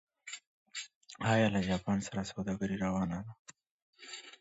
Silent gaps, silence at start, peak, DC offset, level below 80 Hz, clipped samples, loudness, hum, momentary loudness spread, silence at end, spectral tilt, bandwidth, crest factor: 0.47-0.66 s, 0.95-1.01 s, 3.39-3.45 s, 3.71-3.93 s; 0.25 s; -18 dBFS; under 0.1%; -60 dBFS; under 0.1%; -34 LUFS; none; 19 LU; 0.05 s; -5.5 dB/octave; 8 kHz; 18 dB